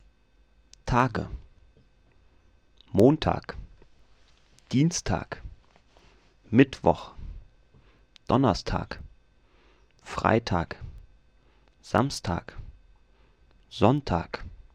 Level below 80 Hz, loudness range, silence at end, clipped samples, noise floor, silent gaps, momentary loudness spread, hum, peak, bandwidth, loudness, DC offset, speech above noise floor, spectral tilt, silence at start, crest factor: -46 dBFS; 4 LU; 0.15 s; under 0.1%; -63 dBFS; none; 22 LU; none; -4 dBFS; 13 kHz; -26 LUFS; under 0.1%; 38 dB; -6 dB/octave; 0.85 s; 24 dB